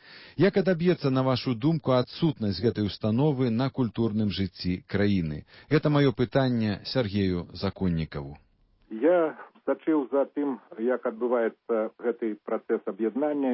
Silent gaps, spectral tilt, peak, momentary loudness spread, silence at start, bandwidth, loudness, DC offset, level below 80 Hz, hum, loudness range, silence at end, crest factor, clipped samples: none; -11 dB/octave; -10 dBFS; 8 LU; 0.1 s; 5.8 kHz; -27 LUFS; under 0.1%; -50 dBFS; none; 3 LU; 0 s; 16 dB; under 0.1%